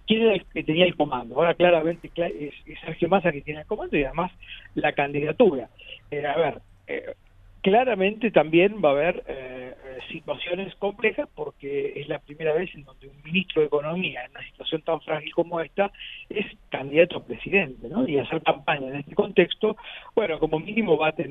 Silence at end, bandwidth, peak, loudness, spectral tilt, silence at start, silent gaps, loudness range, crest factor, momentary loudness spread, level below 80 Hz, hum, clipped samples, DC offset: 0 s; 4 kHz; -2 dBFS; -24 LUFS; -8.5 dB/octave; 0.05 s; none; 5 LU; 22 dB; 15 LU; -52 dBFS; none; under 0.1%; under 0.1%